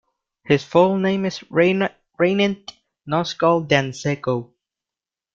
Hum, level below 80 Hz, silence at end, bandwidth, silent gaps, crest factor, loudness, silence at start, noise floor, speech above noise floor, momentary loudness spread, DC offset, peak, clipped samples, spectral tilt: none; -60 dBFS; 0.9 s; 7.6 kHz; none; 20 dB; -20 LUFS; 0.45 s; -89 dBFS; 70 dB; 9 LU; under 0.1%; -2 dBFS; under 0.1%; -6 dB/octave